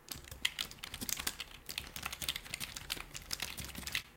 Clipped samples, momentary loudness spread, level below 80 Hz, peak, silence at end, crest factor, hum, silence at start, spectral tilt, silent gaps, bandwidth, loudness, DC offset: under 0.1%; 6 LU; -56 dBFS; -14 dBFS; 0 s; 30 dB; none; 0 s; -1 dB/octave; none; 17 kHz; -40 LUFS; under 0.1%